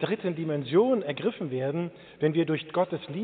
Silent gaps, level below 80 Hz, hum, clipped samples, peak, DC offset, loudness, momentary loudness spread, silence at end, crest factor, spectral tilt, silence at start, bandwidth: none; -72 dBFS; none; under 0.1%; -10 dBFS; under 0.1%; -28 LUFS; 7 LU; 0 s; 16 dB; -6 dB/octave; 0 s; 4.6 kHz